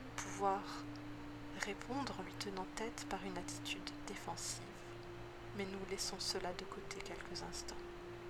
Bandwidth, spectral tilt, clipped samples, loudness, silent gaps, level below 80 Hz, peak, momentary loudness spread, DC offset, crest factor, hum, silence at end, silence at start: 19 kHz; -3.5 dB/octave; under 0.1%; -45 LUFS; none; -60 dBFS; -20 dBFS; 11 LU; under 0.1%; 26 dB; none; 0 s; 0 s